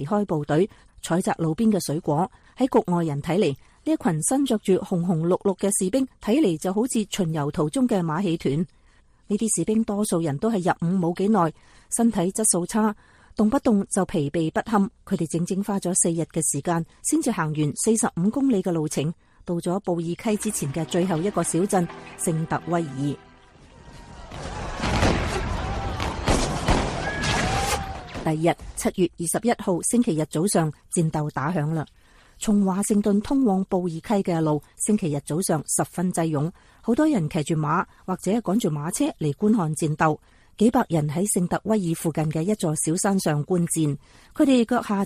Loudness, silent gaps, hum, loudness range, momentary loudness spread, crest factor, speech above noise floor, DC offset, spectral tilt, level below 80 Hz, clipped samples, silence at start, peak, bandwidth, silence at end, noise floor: -24 LUFS; none; none; 2 LU; 7 LU; 16 dB; 33 dB; under 0.1%; -5.5 dB/octave; -42 dBFS; under 0.1%; 0 s; -8 dBFS; 15 kHz; 0 s; -56 dBFS